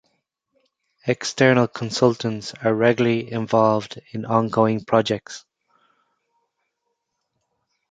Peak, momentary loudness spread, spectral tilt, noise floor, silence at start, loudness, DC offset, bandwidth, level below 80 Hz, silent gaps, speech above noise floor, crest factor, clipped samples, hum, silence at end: -2 dBFS; 12 LU; -5.5 dB/octave; -77 dBFS; 1.05 s; -20 LUFS; under 0.1%; 9.2 kHz; -62 dBFS; none; 56 dB; 22 dB; under 0.1%; none; 2.5 s